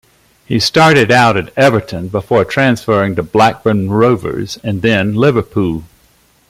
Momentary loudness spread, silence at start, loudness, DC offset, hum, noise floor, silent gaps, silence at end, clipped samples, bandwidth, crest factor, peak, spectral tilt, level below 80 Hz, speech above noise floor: 11 LU; 0.5 s; -12 LUFS; under 0.1%; none; -51 dBFS; none; 0.65 s; under 0.1%; 16 kHz; 12 dB; 0 dBFS; -5.5 dB/octave; -44 dBFS; 39 dB